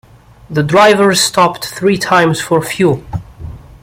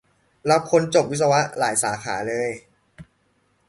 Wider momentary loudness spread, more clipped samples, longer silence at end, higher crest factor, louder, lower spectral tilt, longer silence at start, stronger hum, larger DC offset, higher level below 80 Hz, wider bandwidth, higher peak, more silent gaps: first, 18 LU vs 10 LU; neither; second, 0.25 s vs 0.65 s; second, 12 dB vs 20 dB; first, -11 LUFS vs -21 LUFS; about the same, -4 dB/octave vs -4 dB/octave; about the same, 0.5 s vs 0.45 s; neither; neither; first, -40 dBFS vs -60 dBFS; first, 16.5 kHz vs 12 kHz; first, 0 dBFS vs -4 dBFS; neither